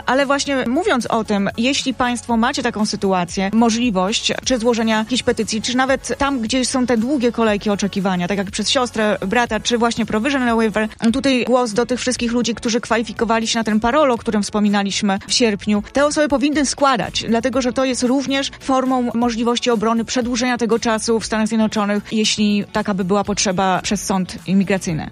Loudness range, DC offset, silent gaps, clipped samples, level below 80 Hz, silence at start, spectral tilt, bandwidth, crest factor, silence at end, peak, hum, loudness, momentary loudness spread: 1 LU; under 0.1%; none; under 0.1%; -44 dBFS; 0.05 s; -4 dB/octave; 13 kHz; 16 dB; 0 s; -2 dBFS; none; -18 LUFS; 4 LU